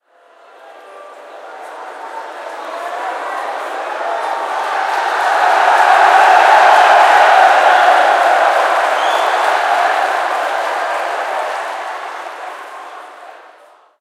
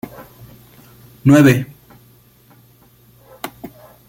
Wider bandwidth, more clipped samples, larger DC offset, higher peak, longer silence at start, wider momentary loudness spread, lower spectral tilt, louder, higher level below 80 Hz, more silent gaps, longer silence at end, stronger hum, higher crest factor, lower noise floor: second, 15 kHz vs 17 kHz; neither; neither; about the same, 0 dBFS vs 0 dBFS; first, 0.65 s vs 0.2 s; second, 21 LU vs 27 LU; second, 1 dB/octave vs -7 dB/octave; about the same, -12 LUFS vs -13 LUFS; second, -76 dBFS vs -50 dBFS; neither; first, 0.65 s vs 0.4 s; neither; about the same, 14 dB vs 18 dB; second, -46 dBFS vs -50 dBFS